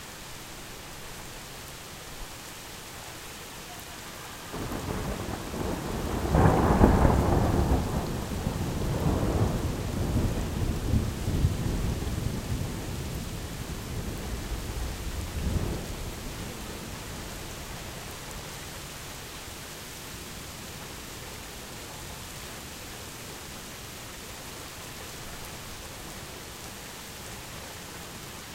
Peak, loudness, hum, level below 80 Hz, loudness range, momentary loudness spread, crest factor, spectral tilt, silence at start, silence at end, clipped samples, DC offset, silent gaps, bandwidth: -2 dBFS; -32 LUFS; none; -36 dBFS; 14 LU; 13 LU; 28 dB; -5.5 dB/octave; 0 s; 0 s; under 0.1%; under 0.1%; none; 16 kHz